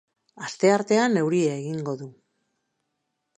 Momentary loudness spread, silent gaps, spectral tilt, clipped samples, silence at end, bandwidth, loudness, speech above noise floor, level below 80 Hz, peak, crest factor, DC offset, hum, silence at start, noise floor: 16 LU; none; -5.5 dB/octave; under 0.1%; 1.25 s; 10 kHz; -23 LUFS; 55 dB; -76 dBFS; -6 dBFS; 20 dB; under 0.1%; none; 0.35 s; -78 dBFS